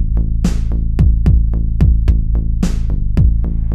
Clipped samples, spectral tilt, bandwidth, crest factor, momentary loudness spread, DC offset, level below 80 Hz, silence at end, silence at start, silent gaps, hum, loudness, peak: under 0.1%; -8 dB/octave; 8 kHz; 12 dB; 6 LU; under 0.1%; -14 dBFS; 0 s; 0 s; none; none; -16 LUFS; -2 dBFS